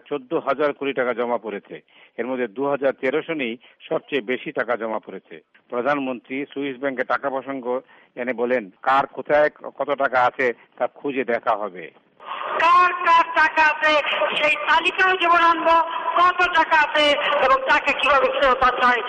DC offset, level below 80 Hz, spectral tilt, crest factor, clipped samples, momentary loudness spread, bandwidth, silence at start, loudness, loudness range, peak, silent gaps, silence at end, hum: under 0.1%; -56 dBFS; -4 dB/octave; 14 dB; under 0.1%; 13 LU; 9.6 kHz; 0.1 s; -20 LUFS; 9 LU; -8 dBFS; none; 0 s; none